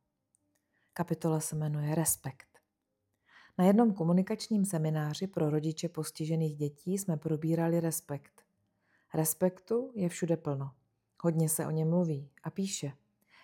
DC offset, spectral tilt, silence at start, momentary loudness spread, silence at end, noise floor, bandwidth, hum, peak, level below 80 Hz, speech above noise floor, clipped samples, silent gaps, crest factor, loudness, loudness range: under 0.1%; -6 dB/octave; 0.95 s; 10 LU; 0.5 s; -83 dBFS; 17.5 kHz; none; -14 dBFS; -74 dBFS; 52 dB; under 0.1%; none; 20 dB; -32 LUFS; 4 LU